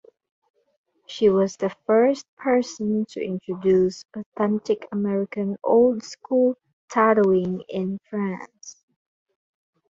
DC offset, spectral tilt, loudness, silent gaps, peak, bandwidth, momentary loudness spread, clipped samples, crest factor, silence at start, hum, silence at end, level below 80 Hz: under 0.1%; -6.5 dB/octave; -23 LUFS; 2.28-2.37 s, 4.26-4.32 s, 6.73-6.88 s; -6 dBFS; 7.8 kHz; 14 LU; under 0.1%; 16 dB; 1.1 s; none; 1.15 s; -64 dBFS